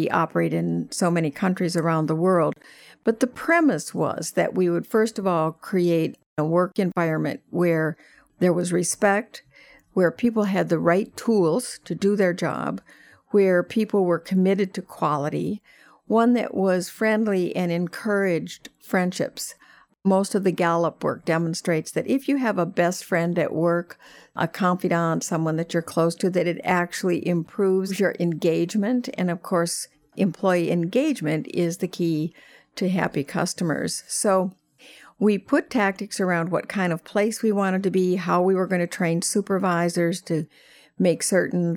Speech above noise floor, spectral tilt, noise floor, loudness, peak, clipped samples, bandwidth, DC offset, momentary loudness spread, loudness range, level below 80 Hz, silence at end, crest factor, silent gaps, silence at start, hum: 27 dB; -5.5 dB/octave; -50 dBFS; -23 LUFS; -6 dBFS; under 0.1%; 17.5 kHz; under 0.1%; 7 LU; 2 LU; -68 dBFS; 0 s; 16 dB; 6.26-6.36 s; 0 s; none